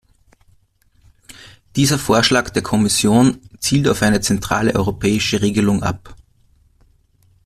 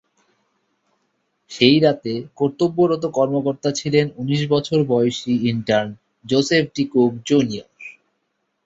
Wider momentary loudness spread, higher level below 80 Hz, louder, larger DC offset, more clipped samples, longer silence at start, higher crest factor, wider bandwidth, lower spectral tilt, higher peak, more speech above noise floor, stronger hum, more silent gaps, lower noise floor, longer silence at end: second, 6 LU vs 13 LU; first, -42 dBFS vs -58 dBFS; first, -16 LUFS vs -19 LUFS; neither; neither; second, 1.3 s vs 1.5 s; about the same, 18 dB vs 18 dB; first, 14.5 kHz vs 8 kHz; about the same, -4.5 dB/octave vs -5.5 dB/octave; about the same, 0 dBFS vs -2 dBFS; second, 41 dB vs 54 dB; neither; neither; second, -57 dBFS vs -72 dBFS; first, 1.3 s vs 0.75 s